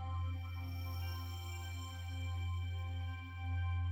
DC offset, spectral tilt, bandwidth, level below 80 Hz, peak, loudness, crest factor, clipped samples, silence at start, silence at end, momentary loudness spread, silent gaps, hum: under 0.1%; -5.5 dB/octave; 16.5 kHz; -50 dBFS; -30 dBFS; -43 LUFS; 10 dB; under 0.1%; 0 s; 0 s; 5 LU; none; none